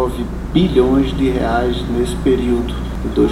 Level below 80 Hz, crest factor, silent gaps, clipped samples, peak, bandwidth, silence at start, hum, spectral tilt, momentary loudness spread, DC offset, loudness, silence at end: -24 dBFS; 16 dB; none; under 0.1%; 0 dBFS; 15 kHz; 0 s; none; -7 dB/octave; 7 LU; under 0.1%; -17 LUFS; 0 s